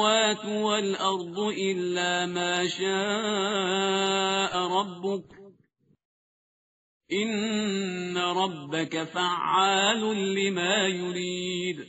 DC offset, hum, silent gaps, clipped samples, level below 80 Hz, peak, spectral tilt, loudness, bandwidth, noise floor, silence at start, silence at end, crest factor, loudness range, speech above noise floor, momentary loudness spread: under 0.1%; none; 6.05-7.00 s; under 0.1%; -72 dBFS; -8 dBFS; -2 dB/octave; -26 LUFS; 8 kHz; -67 dBFS; 0 s; 0 s; 20 dB; 6 LU; 40 dB; 7 LU